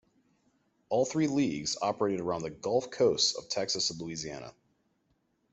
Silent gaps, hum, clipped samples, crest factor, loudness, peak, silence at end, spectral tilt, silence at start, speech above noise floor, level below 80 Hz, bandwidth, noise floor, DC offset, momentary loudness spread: none; none; under 0.1%; 18 dB; -30 LUFS; -14 dBFS; 1 s; -3.5 dB/octave; 0.9 s; 44 dB; -68 dBFS; 8.2 kHz; -75 dBFS; under 0.1%; 11 LU